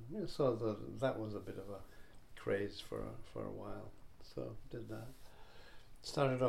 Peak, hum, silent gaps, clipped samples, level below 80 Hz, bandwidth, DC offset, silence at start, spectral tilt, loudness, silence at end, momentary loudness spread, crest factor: -20 dBFS; none; none; under 0.1%; -60 dBFS; 16 kHz; under 0.1%; 0 s; -6.5 dB/octave; -43 LUFS; 0 s; 24 LU; 22 dB